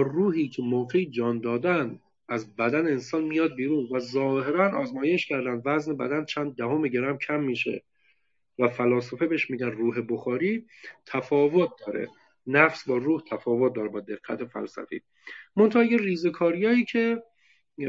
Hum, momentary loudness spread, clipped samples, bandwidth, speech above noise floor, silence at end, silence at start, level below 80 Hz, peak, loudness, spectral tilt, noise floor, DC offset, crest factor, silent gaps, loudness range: none; 13 LU; under 0.1%; 7.6 kHz; 45 dB; 0 s; 0 s; -76 dBFS; -4 dBFS; -26 LUFS; -7 dB/octave; -71 dBFS; under 0.1%; 24 dB; none; 3 LU